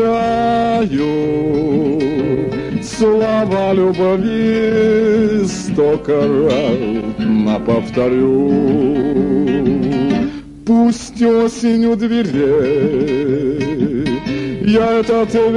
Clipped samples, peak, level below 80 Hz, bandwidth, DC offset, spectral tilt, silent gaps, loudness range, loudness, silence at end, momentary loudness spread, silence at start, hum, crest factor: under 0.1%; -2 dBFS; -40 dBFS; 11 kHz; under 0.1%; -7 dB/octave; none; 1 LU; -15 LUFS; 0 s; 5 LU; 0 s; none; 12 dB